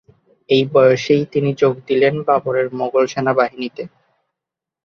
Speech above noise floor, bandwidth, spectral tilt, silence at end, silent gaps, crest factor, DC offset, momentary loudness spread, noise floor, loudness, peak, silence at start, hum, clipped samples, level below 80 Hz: 69 dB; 7 kHz; -6.5 dB/octave; 1 s; none; 16 dB; under 0.1%; 10 LU; -85 dBFS; -16 LUFS; -2 dBFS; 0.5 s; none; under 0.1%; -62 dBFS